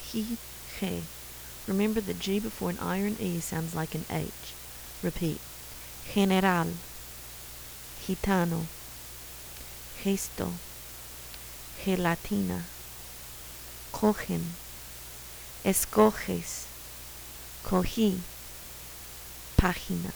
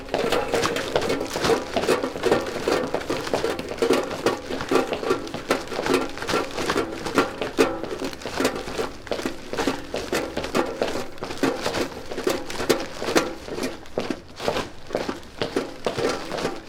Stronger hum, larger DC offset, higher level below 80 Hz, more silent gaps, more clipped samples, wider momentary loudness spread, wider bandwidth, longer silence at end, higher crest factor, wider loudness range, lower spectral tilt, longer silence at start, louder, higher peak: neither; neither; about the same, -44 dBFS vs -46 dBFS; neither; neither; first, 15 LU vs 7 LU; first, over 20 kHz vs 18 kHz; about the same, 0 s vs 0 s; about the same, 26 dB vs 24 dB; about the same, 5 LU vs 3 LU; about the same, -5 dB/octave vs -4 dB/octave; about the same, 0 s vs 0 s; second, -32 LUFS vs -26 LUFS; second, -6 dBFS vs -2 dBFS